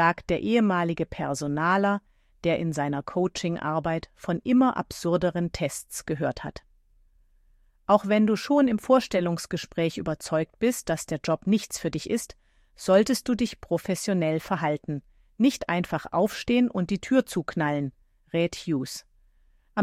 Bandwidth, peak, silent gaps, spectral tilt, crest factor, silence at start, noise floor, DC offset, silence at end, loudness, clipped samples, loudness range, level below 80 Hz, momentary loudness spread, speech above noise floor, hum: 15.5 kHz; -8 dBFS; none; -5.5 dB/octave; 18 dB; 0 s; -61 dBFS; under 0.1%; 0 s; -26 LUFS; under 0.1%; 3 LU; -54 dBFS; 10 LU; 36 dB; none